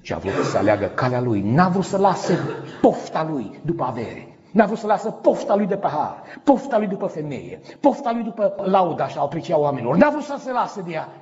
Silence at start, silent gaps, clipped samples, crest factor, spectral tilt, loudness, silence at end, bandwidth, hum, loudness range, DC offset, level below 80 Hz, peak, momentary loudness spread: 0.05 s; none; under 0.1%; 18 dB; -6 dB/octave; -21 LUFS; 0 s; 8 kHz; none; 2 LU; under 0.1%; -58 dBFS; -2 dBFS; 10 LU